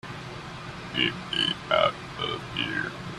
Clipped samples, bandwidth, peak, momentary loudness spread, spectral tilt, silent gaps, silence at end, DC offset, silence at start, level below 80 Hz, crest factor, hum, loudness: under 0.1%; 13 kHz; -6 dBFS; 14 LU; -4.5 dB/octave; none; 0 s; under 0.1%; 0.05 s; -54 dBFS; 24 dB; none; -27 LUFS